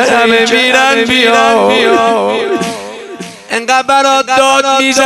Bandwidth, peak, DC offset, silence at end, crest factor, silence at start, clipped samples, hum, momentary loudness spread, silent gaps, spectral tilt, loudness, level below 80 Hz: 16 kHz; 0 dBFS; under 0.1%; 0 s; 10 dB; 0 s; 1%; none; 13 LU; none; -2 dB/octave; -9 LUFS; -50 dBFS